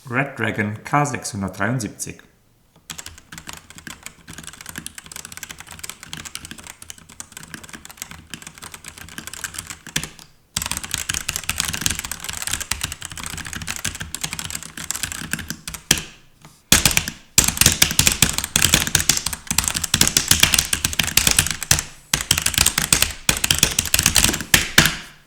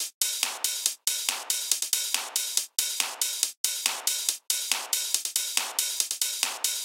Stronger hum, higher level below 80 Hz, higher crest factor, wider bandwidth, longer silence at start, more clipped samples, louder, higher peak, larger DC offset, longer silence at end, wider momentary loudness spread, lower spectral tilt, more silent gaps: neither; first, -38 dBFS vs under -90 dBFS; about the same, 22 dB vs 26 dB; first, over 20 kHz vs 17 kHz; about the same, 0.05 s vs 0 s; neither; first, -18 LUFS vs -26 LUFS; first, 0 dBFS vs -4 dBFS; neither; first, 0.15 s vs 0 s; first, 21 LU vs 2 LU; first, -1.5 dB/octave vs 6 dB/octave; second, none vs 0.14-0.21 s, 3.57-3.64 s